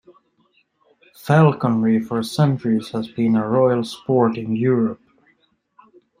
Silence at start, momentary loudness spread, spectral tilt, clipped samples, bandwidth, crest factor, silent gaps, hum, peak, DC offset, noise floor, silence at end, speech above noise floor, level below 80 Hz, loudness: 1.25 s; 9 LU; -8 dB/octave; under 0.1%; 15.5 kHz; 18 dB; none; none; -2 dBFS; under 0.1%; -63 dBFS; 1.25 s; 45 dB; -62 dBFS; -19 LUFS